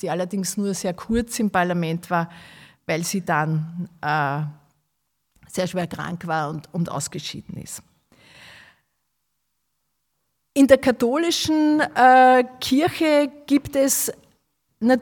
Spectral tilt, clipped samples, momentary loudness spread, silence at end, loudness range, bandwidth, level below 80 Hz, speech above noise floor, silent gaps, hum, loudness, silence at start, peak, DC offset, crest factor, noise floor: -4.5 dB/octave; under 0.1%; 16 LU; 0 s; 13 LU; 18 kHz; -52 dBFS; 55 dB; none; none; -21 LUFS; 0.05 s; 0 dBFS; under 0.1%; 22 dB; -76 dBFS